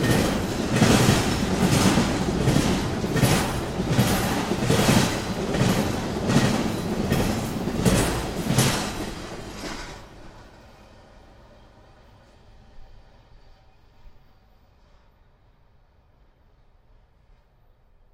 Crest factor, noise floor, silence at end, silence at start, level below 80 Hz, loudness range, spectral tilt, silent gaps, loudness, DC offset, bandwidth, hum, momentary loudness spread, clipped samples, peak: 20 dB; -57 dBFS; 4 s; 0 s; -38 dBFS; 14 LU; -5 dB/octave; none; -23 LUFS; under 0.1%; 16 kHz; none; 13 LU; under 0.1%; -4 dBFS